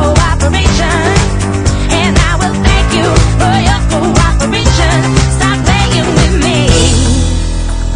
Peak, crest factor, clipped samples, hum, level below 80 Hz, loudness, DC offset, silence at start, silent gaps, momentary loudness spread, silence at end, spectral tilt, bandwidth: 0 dBFS; 8 dB; 0.3%; none; -14 dBFS; -10 LUFS; under 0.1%; 0 s; none; 3 LU; 0 s; -4.5 dB/octave; 10.5 kHz